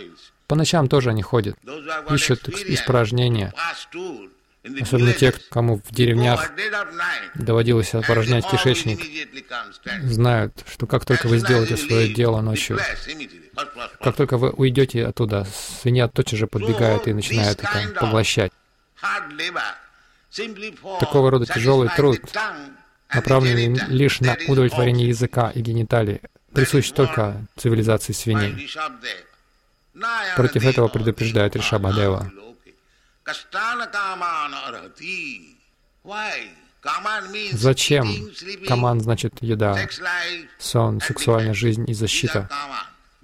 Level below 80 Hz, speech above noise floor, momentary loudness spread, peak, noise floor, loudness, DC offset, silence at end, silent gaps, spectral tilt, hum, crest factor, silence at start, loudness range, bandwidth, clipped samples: -46 dBFS; 41 dB; 13 LU; -4 dBFS; -62 dBFS; -21 LUFS; under 0.1%; 0.35 s; none; -5.5 dB/octave; none; 16 dB; 0 s; 5 LU; 15.5 kHz; under 0.1%